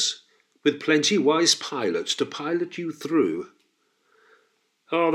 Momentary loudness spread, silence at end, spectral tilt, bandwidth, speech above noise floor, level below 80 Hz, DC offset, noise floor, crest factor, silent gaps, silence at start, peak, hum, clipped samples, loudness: 12 LU; 0 s; -3 dB/octave; 14.5 kHz; 45 dB; -84 dBFS; under 0.1%; -69 dBFS; 20 dB; none; 0 s; -6 dBFS; none; under 0.1%; -24 LUFS